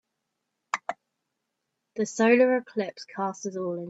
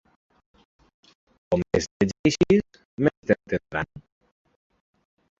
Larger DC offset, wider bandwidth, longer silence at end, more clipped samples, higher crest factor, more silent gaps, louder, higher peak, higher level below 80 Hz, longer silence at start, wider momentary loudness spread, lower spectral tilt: neither; about the same, 8 kHz vs 8 kHz; second, 0 s vs 1.4 s; neither; about the same, 20 dB vs 22 dB; second, none vs 1.91-2.00 s, 2.19-2.24 s, 2.85-2.98 s, 3.17-3.23 s; about the same, -26 LUFS vs -24 LUFS; second, -8 dBFS vs -4 dBFS; second, -78 dBFS vs -50 dBFS; second, 0.75 s vs 1.5 s; first, 16 LU vs 10 LU; about the same, -5 dB/octave vs -6 dB/octave